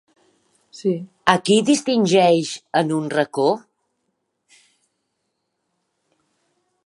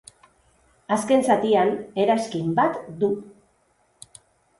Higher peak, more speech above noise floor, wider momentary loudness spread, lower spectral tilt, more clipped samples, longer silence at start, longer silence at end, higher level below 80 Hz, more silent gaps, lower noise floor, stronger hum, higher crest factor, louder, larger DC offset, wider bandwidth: first, 0 dBFS vs -6 dBFS; first, 56 dB vs 43 dB; about the same, 9 LU vs 7 LU; about the same, -4.5 dB/octave vs -5.5 dB/octave; neither; second, 0.75 s vs 0.9 s; first, 3.25 s vs 1.3 s; about the same, -66 dBFS vs -64 dBFS; neither; first, -75 dBFS vs -65 dBFS; neither; about the same, 22 dB vs 18 dB; first, -19 LUFS vs -22 LUFS; neither; about the same, 11.5 kHz vs 11.5 kHz